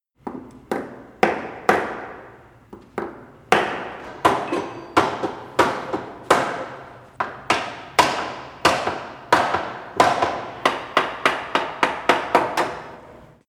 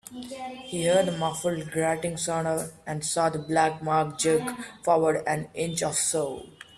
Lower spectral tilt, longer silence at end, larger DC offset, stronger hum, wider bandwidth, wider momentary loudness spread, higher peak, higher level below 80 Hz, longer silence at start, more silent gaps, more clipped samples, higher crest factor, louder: about the same, -3.5 dB/octave vs -4 dB/octave; about the same, 0.25 s vs 0.15 s; neither; neither; first, 17.5 kHz vs 14.5 kHz; first, 16 LU vs 11 LU; first, 0 dBFS vs -10 dBFS; first, -56 dBFS vs -62 dBFS; first, 0.25 s vs 0.05 s; neither; neither; about the same, 22 dB vs 18 dB; first, -22 LUFS vs -26 LUFS